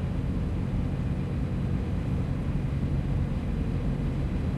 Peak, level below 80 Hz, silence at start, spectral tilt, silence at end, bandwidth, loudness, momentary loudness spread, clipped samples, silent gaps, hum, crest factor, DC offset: -16 dBFS; -34 dBFS; 0 s; -9 dB/octave; 0 s; 11 kHz; -30 LUFS; 1 LU; under 0.1%; none; none; 12 dB; under 0.1%